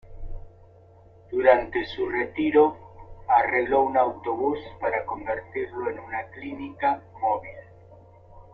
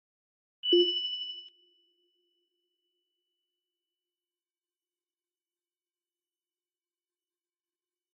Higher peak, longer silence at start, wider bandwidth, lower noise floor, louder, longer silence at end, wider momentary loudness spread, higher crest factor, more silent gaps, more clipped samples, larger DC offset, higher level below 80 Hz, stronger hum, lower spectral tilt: first, -4 dBFS vs -14 dBFS; second, 0.05 s vs 0.65 s; about the same, 5.8 kHz vs 5.6 kHz; second, -52 dBFS vs under -90 dBFS; first, -25 LUFS vs -28 LUFS; second, 0.1 s vs 6.65 s; about the same, 16 LU vs 15 LU; about the same, 22 dB vs 24 dB; neither; neither; neither; first, -48 dBFS vs under -90 dBFS; neither; first, -8 dB/octave vs -0.5 dB/octave